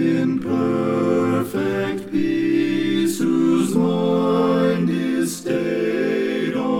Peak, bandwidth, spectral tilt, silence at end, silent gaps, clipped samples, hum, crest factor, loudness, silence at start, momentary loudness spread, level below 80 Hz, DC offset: -6 dBFS; 16.5 kHz; -6 dB/octave; 0 s; none; under 0.1%; none; 14 dB; -20 LUFS; 0 s; 4 LU; -56 dBFS; 0.3%